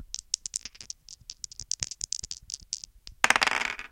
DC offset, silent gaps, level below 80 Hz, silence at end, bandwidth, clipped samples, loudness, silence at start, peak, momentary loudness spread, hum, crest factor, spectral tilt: under 0.1%; none; -56 dBFS; 0.05 s; 16.5 kHz; under 0.1%; -29 LUFS; 0 s; 0 dBFS; 19 LU; none; 32 dB; 0.5 dB/octave